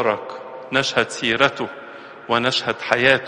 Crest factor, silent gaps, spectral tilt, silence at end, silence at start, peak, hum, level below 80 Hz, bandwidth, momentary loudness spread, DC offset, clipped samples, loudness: 20 dB; none; -3.5 dB/octave; 0 s; 0 s; 0 dBFS; none; -58 dBFS; 11.5 kHz; 17 LU; under 0.1%; under 0.1%; -20 LUFS